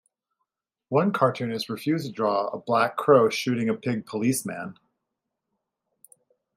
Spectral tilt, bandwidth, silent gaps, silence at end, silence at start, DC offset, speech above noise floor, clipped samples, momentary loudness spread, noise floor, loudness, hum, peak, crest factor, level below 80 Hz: -5.5 dB/octave; 16 kHz; none; 1.85 s; 0.9 s; under 0.1%; 59 dB; under 0.1%; 10 LU; -83 dBFS; -24 LUFS; none; -6 dBFS; 22 dB; -72 dBFS